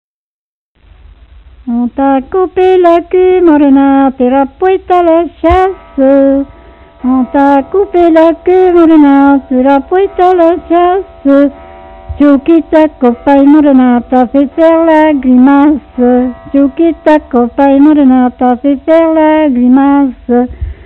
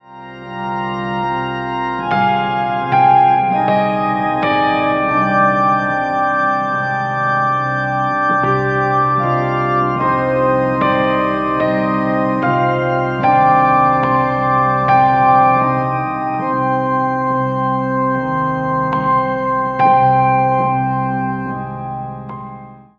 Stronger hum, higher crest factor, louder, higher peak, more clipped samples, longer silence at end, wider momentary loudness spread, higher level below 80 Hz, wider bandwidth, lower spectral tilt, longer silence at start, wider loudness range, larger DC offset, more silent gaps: neither; second, 8 dB vs 14 dB; first, -7 LUFS vs -15 LUFS; about the same, 0 dBFS vs -2 dBFS; first, 0.9% vs under 0.1%; about the same, 0.15 s vs 0.15 s; second, 6 LU vs 9 LU; first, -32 dBFS vs -46 dBFS; second, 4.2 kHz vs 6.6 kHz; about the same, -8.5 dB/octave vs -8 dB/octave; first, 1.65 s vs 0.1 s; about the same, 3 LU vs 3 LU; neither; neither